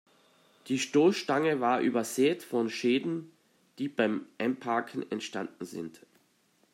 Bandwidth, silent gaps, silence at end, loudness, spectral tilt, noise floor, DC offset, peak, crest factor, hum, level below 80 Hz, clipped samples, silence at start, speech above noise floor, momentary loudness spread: 16 kHz; none; 0.85 s; -30 LUFS; -4.5 dB/octave; -69 dBFS; under 0.1%; -12 dBFS; 18 dB; none; -82 dBFS; under 0.1%; 0.65 s; 40 dB; 13 LU